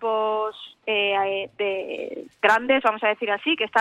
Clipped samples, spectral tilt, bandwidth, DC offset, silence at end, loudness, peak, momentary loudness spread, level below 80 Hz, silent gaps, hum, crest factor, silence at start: under 0.1%; -3.5 dB/octave; 12 kHz; under 0.1%; 0 s; -23 LUFS; -6 dBFS; 12 LU; -68 dBFS; none; none; 18 dB; 0 s